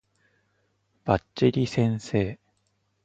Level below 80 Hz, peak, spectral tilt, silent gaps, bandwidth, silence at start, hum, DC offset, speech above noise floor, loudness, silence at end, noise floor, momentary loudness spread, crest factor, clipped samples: -52 dBFS; -4 dBFS; -7 dB/octave; none; 8.6 kHz; 1.05 s; 50 Hz at -50 dBFS; under 0.1%; 48 dB; -26 LUFS; 0.7 s; -72 dBFS; 11 LU; 24 dB; under 0.1%